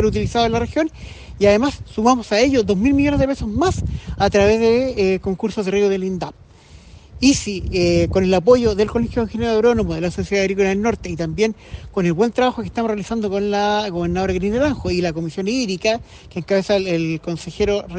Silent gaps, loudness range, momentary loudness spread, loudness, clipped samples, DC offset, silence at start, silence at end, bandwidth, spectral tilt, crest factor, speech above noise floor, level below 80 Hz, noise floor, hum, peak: none; 3 LU; 9 LU; -19 LUFS; under 0.1%; under 0.1%; 0 s; 0 s; 9.8 kHz; -5.5 dB/octave; 16 dB; 25 dB; -36 dBFS; -44 dBFS; none; -2 dBFS